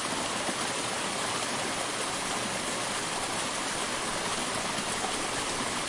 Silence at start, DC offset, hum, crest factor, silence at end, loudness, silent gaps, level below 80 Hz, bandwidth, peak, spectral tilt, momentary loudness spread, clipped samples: 0 s; under 0.1%; none; 14 dB; 0 s; -30 LUFS; none; -56 dBFS; 11.5 kHz; -18 dBFS; -1.5 dB/octave; 1 LU; under 0.1%